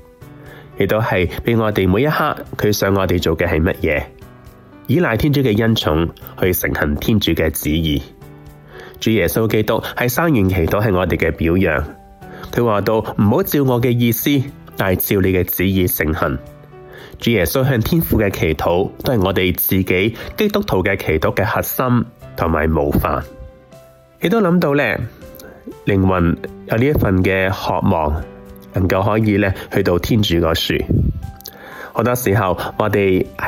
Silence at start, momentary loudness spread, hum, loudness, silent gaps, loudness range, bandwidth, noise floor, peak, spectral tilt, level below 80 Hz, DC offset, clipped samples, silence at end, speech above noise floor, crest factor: 0.2 s; 9 LU; none; -17 LUFS; none; 2 LU; 17.5 kHz; -44 dBFS; -4 dBFS; -6 dB/octave; -34 dBFS; under 0.1%; under 0.1%; 0 s; 28 dB; 14 dB